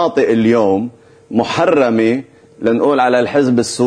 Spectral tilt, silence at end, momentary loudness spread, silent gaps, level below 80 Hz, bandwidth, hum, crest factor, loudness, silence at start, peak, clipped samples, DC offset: -5.5 dB/octave; 0 s; 8 LU; none; -54 dBFS; 11 kHz; none; 12 dB; -14 LUFS; 0 s; -2 dBFS; under 0.1%; under 0.1%